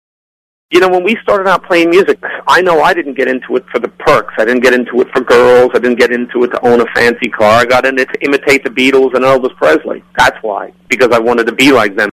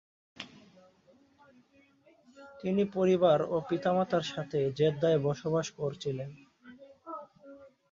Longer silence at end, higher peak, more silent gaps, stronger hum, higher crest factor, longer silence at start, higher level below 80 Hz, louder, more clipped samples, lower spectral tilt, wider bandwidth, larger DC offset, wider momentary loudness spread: second, 0 s vs 0.25 s; first, 0 dBFS vs -12 dBFS; neither; neither; second, 10 dB vs 20 dB; first, 0.7 s vs 0.4 s; first, -44 dBFS vs -70 dBFS; first, -10 LUFS vs -30 LUFS; neither; second, -4.5 dB/octave vs -6.5 dB/octave; first, 14.5 kHz vs 7.6 kHz; neither; second, 7 LU vs 21 LU